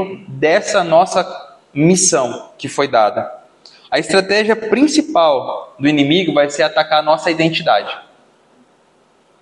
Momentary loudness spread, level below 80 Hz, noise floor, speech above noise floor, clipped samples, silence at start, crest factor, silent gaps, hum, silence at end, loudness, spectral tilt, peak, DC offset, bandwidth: 13 LU; -60 dBFS; -54 dBFS; 39 dB; under 0.1%; 0 s; 16 dB; none; none; 1.4 s; -14 LUFS; -3.5 dB/octave; 0 dBFS; under 0.1%; 11.5 kHz